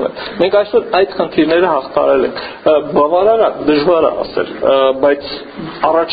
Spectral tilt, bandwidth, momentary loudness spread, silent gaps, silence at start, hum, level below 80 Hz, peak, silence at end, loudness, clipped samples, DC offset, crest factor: -3 dB/octave; 5 kHz; 8 LU; none; 0 s; none; -46 dBFS; 0 dBFS; 0 s; -13 LUFS; under 0.1%; under 0.1%; 14 dB